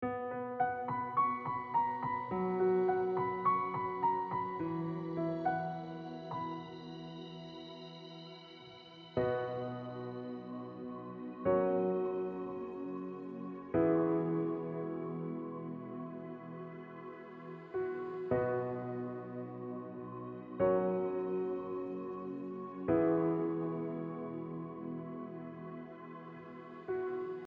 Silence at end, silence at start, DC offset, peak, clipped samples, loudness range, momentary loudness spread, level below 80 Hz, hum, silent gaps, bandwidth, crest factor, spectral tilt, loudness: 0 s; 0 s; under 0.1%; -20 dBFS; under 0.1%; 9 LU; 16 LU; -68 dBFS; none; none; 6 kHz; 18 dB; -6.5 dB/octave; -37 LUFS